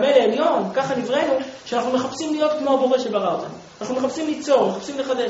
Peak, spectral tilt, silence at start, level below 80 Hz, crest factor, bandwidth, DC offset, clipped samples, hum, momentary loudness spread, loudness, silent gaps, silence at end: -2 dBFS; -3.5 dB/octave; 0 s; -64 dBFS; 18 dB; 8 kHz; under 0.1%; under 0.1%; none; 8 LU; -21 LUFS; none; 0 s